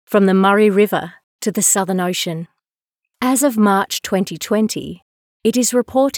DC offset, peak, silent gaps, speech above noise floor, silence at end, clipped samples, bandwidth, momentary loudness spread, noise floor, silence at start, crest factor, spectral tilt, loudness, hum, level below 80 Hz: under 0.1%; -2 dBFS; 1.24-1.39 s, 5.02-5.40 s; 66 dB; 0 s; under 0.1%; over 20 kHz; 12 LU; -82 dBFS; 0.1 s; 14 dB; -4 dB/octave; -16 LUFS; none; -62 dBFS